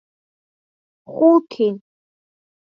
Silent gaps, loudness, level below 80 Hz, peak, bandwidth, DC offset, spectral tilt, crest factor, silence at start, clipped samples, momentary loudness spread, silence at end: none; -17 LUFS; -78 dBFS; -2 dBFS; 5.6 kHz; under 0.1%; -8.5 dB/octave; 18 dB; 1.1 s; under 0.1%; 20 LU; 0.9 s